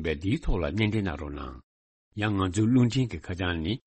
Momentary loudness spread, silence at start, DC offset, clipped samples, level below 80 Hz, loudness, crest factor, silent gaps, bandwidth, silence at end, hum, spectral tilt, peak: 14 LU; 0 s; under 0.1%; under 0.1%; -38 dBFS; -28 LUFS; 14 dB; 1.63-2.11 s; 8.4 kHz; 0.1 s; none; -6.5 dB/octave; -12 dBFS